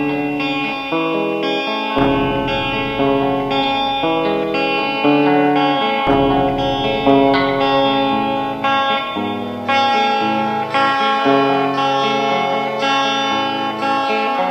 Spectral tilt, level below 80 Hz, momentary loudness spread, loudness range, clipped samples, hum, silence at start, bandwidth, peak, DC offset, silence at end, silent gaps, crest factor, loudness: -5.5 dB/octave; -42 dBFS; 5 LU; 2 LU; under 0.1%; none; 0 s; 13 kHz; 0 dBFS; under 0.1%; 0 s; none; 16 dB; -16 LUFS